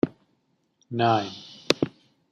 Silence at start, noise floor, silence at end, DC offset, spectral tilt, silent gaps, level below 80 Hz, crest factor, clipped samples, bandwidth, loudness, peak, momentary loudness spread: 0.05 s; -70 dBFS; 0.45 s; under 0.1%; -5 dB/octave; none; -64 dBFS; 26 dB; under 0.1%; 13.5 kHz; -26 LUFS; -2 dBFS; 13 LU